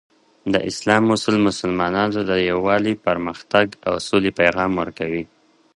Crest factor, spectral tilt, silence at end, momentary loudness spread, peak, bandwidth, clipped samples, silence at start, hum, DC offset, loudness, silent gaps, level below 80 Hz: 20 dB; -5 dB/octave; 0.5 s; 8 LU; 0 dBFS; 11.5 kHz; under 0.1%; 0.45 s; none; under 0.1%; -20 LUFS; none; -50 dBFS